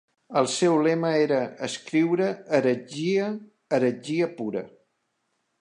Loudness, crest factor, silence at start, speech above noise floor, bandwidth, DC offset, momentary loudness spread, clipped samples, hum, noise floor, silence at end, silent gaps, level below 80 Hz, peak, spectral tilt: -25 LUFS; 18 dB; 0.3 s; 51 dB; 11 kHz; under 0.1%; 10 LU; under 0.1%; none; -75 dBFS; 0.95 s; none; -76 dBFS; -8 dBFS; -5.5 dB/octave